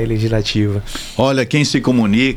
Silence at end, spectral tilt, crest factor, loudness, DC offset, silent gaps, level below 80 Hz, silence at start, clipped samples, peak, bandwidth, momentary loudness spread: 0 s; -5.5 dB/octave; 14 dB; -16 LUFS; under 0.1%; none; -32 dBFS; 0 s; under 0.1%; -2 dBFS; 15 kHz; 6 LU